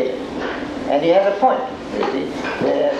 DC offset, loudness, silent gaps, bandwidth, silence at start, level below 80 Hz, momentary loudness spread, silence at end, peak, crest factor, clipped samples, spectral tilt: under 0.1%; -19 LUFS; none; 9.8 kHz; 0 s; -48 dBFS; 10 LU; 0 s; -4 dBFS; 16 dB; under 0.1%; -5.5 dB/octave